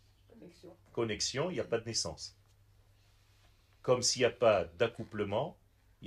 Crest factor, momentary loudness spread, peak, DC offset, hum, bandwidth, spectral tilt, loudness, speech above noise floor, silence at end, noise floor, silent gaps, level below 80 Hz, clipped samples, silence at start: 20 dB; 16 LU; -14 dBFS; under 0.1%; none; 14 kHz; -3.5 dB/octave; -33 LUFS; 32 dB; 0 s; -65 dBFS; none; -64 dBFS; under 0.1%; 0.4 s